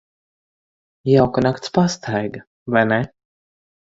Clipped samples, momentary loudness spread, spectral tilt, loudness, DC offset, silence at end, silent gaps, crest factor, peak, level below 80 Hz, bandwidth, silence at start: under 0.1%; 14 LU; -6.5 dB/octave; -19 LUFS; under 0.1%; 0.75 s; 2.47-2.66 s; 20 dB; -2 dBFS; -52 dBFS; 7.8 kHz; 1.05 s